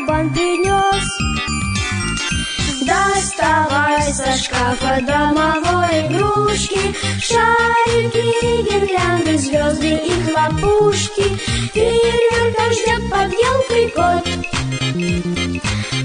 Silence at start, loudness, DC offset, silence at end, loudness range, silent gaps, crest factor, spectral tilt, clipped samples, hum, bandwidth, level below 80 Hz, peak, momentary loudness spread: 0 s; -16 LUFS; under 0.1%; 0 s; 2 LU; none; 14 dB; -4 dB/octave; under 0.1%; none; 10 kHz; -32 dBFS; -2 dBFS; 5 LU